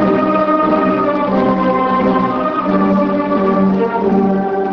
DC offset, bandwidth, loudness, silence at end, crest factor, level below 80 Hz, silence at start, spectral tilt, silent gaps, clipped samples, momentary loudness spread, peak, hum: under 0.1%; 5.8 kHz; -14 LUFS; 0 s; 12 dB; -44 dBFS; 0 s; -9.5 dB/octave; none; under 0.1%; 2 LU; -2 dBFS; none